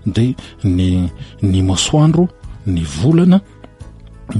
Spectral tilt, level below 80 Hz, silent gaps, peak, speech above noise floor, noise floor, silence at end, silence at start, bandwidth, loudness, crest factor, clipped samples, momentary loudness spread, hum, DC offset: -6 dB/octave; -34 dBFS; none; -2 dBFS; 22 dB; -36 dBFS; 0 s; 0.05 s; 11.5 kHz; -15 LUFS; 12 dB; under 0.1%; 9 LU; none; under 0.1%